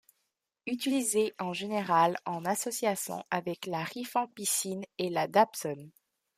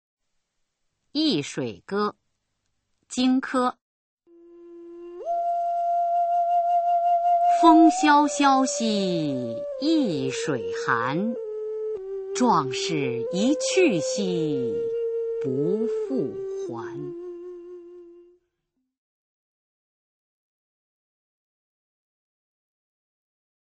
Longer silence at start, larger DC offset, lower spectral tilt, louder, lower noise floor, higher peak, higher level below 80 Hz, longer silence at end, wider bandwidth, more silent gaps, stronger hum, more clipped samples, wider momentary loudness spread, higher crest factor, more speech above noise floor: second, 0.65 s vs 1.15 s; neither; about the same, -3.5 dB/octave vs -4.5 dB/octave; second, -31 LUFS vs -23 LUFS; about the same, -82 dBFS vs -79 dBFS; second, -10 dBFS vs -4 dBFS; second, -78 dBFS vs -68 dBFS; second, 0.5 s vs 5.55 s; first, 15.5 kHz vs 8.8 kHz; second, none vs 3.81-4.17 s; neither; neither; second, 10 LU vs 15 LU; about the same, 22 dB vs 22 dB; second, 51 dB vs 56 dB